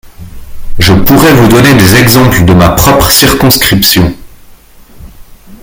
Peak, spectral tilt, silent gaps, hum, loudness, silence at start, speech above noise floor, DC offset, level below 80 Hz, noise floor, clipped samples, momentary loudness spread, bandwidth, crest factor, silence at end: 0 dBFS; -4.5 dB/octave; none; none; -4 LUFS; 0.2 s; 30 dB; under 0.1%; -22 dBFS; -34 dBFS; 5%; 5 LU; over 20 kHz; 6 dB; 0.1 s